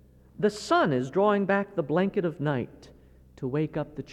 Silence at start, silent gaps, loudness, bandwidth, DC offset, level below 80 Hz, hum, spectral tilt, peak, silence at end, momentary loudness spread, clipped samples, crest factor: 0.4 s; none; -27 LUFS; 12 kHz; under 0.1%; -58 dBFS; none; -6.5 dB/octave; -10 dBFS; 0 s; 9 LU; under 0.1%; 16 dB